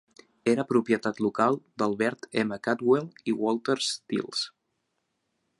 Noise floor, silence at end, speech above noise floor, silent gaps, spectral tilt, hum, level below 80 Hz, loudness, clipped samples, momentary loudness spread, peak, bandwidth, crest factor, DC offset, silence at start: -78 dBFS; 1.1 s; 51 dB; none; -4.5 dB/octave; none; -72 dBFS; -27 LUFS; under 0.1%; 7 LU; -8 dBFS; 11.5 kHz; 20 dB; under 0.1%; 0.45 s